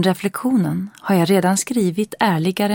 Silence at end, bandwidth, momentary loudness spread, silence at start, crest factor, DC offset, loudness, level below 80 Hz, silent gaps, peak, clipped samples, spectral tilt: 0 s; 17 kHz; 6 LU; 0 s; 16 dB; under 0.1%; -19 LUFS; -62 dBFS; none; -2 dBFS; under 0.1%; -5.5 dB/octave